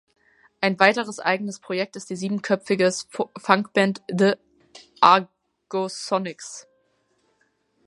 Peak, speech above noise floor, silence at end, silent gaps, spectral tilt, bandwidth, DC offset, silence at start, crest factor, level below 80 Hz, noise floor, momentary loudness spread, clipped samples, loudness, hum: 0 dBFS; 46 dB; 1.25 s; none; -4.5 dB/octave; 11.5 kHz; under 0.1%; 0.6 s; 24 dB; -72 dBFS; -68 dBFS; 13 LU; under 0.1%; -22 LUFS; none